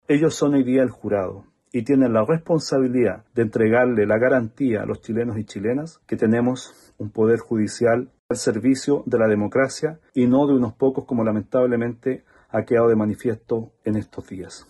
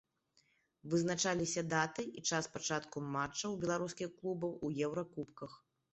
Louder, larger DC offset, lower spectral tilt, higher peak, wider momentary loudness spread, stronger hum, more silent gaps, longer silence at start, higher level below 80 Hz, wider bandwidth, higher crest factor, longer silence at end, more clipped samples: first, -21 LUFS vs -38 LUFS; neither; first, -6.5 dB/octave vs -4 dB/octave; first, -6 dBFS vs -18 dBFS; about the same, 10 LU vs 11 LU; neither; first, 8.19-8.29 s vs none; second, 0.1 s vs 0.85 s; first, -58 dBFS vs -72 dBFS; first, 12 kHz vs 8.2 kHz; second, 14 dB vs 20 dB; second, 0.1 s vs 0.35 s; neither